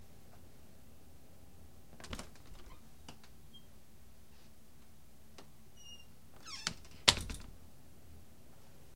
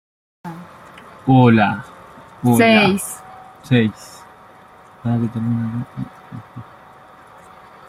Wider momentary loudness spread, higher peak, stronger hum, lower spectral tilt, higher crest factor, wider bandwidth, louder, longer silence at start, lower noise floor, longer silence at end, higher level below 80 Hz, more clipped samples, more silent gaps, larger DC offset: second, 22 LU vs 26 LU; about the same, -2 dBFS vs -2 dBFS; neither; second, -1.5 dB/octave vs -6 dB/octave; first, 42 dB vs 18 dB; about the same, 16.5 kHz vs 15.5 kHz; second, -35 LUFS vs -17 LUFS; second, 0 s vs 0.45 s; first, -62 dBFS vs -45 dBFS; second, 0 s vs 1.25 s; about the same, -58 dBFS vs -54 dBFS; neither; neither; first, 0.3% vs under 0.1%